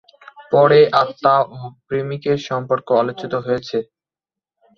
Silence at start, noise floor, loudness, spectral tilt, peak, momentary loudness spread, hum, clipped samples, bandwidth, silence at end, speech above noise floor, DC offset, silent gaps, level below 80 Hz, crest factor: 0.4 s; -89 dBFS; -17 LUFS; -6.5 dB/octave; 0 dBFS; 13 LU; none; under 0.1%; 6.8 kHz; 0.95 s; 72 dB; under 0.1%; none; -60 dBFS; 18 dB